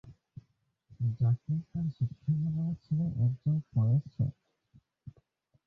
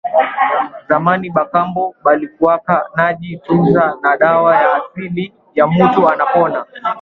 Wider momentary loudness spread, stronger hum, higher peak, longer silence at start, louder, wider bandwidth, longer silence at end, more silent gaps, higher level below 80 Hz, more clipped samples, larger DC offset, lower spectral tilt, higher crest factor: second, 6 LU vs 10 LU; neither; second, -18 dBFS vs 0 dBFS; about the same, 0.05 s vs 0.05 s; second, -32 LUFS vs -14 LUFS; about the same, 4.7 kHz vs 4.9 kHz; first, 0.55 s vs 0 s; neither; second, -60 dBFS vs -52 dBFS; neither; neither; first, -12 dB/octave vs -9.5 dB/octave; about the same, 14 dB vs 14 dB